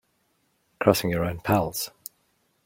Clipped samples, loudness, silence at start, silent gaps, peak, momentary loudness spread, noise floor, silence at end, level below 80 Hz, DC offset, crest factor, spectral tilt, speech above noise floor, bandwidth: under 0.1%; -25 LUFS; 0.8 s; none; -2 dBFS; 17 LU; -70 dBFS; 0.75 s; -52 dBFS; under 0.1%; 24 dB; -5 dB/octave; 46 dB; 16.5 kHz